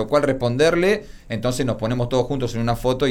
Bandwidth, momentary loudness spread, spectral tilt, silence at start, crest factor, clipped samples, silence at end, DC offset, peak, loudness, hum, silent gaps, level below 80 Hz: 18 kHz; 7 LU; -6 dB/octave; 0 s; 14 dB; under 0.1%; 0 s; under 0.1%; -6 dBFS; -21 LUFS; none; none; -38 dBFS